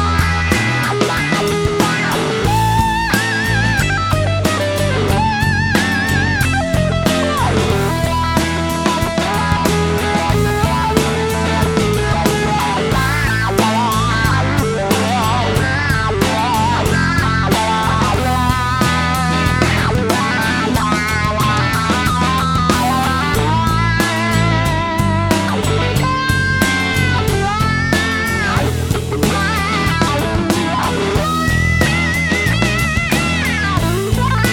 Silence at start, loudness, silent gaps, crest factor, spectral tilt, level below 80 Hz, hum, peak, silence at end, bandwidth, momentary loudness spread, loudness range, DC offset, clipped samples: 0 s; -15 LUFS; none; 14 dB; -5 dB/octave; -28 dBFS; none; 0 dBFS; 0 s; 18.5 kHz; 2 LU; 1 LU; under 0.1%; under 0.1%